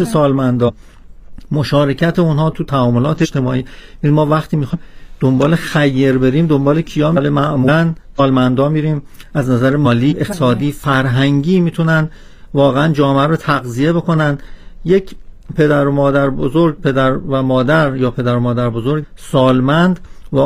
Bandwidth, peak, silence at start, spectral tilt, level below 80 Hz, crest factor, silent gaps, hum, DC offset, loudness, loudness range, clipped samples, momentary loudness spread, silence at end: 15 kHz; 0 dBFS; 0 s; -7.5 dB/octave; -36 dBFS; 14 dB; none; none; under 0.1%; -14 LUFS; 2 LU; under 0.1%; 7 LU; 0 s